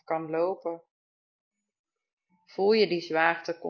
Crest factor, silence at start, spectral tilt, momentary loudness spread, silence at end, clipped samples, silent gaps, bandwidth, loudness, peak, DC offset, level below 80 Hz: 22 dB; 0.1 s; -5.5 dB/octave; 15 LU; 0 s; under 0.1%; 0.91-1.51 s, 1.79-1.84 s, 2.13-2.17 s; 6.8 kHz; -27 LUFS; -6 dBFS; under 0.1%; -80 dBFS